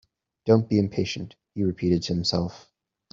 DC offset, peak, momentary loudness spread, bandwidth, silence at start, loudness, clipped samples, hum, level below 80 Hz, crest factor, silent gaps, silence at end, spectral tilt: under 0.1%; -4 dBFS; 13 LU; 7.6 kHz; 0.45 s; -25 LUFS; under 0.1%; none; -56 dBFS; 22 dB; none; 0.55 s; -6.5 dB/octave